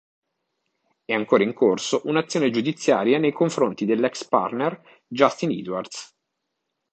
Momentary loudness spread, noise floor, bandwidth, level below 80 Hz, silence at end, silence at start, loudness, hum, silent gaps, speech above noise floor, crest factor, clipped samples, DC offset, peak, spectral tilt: 10 LU; -79 dBFS; 9 kHz; -70 dBFS; 0.85 s; 1.1 s; -22 LUFS; none; none; 57 dB; 22 dB; under 0.1%; under 0.1%; -2 dBFS; -5 dB/octave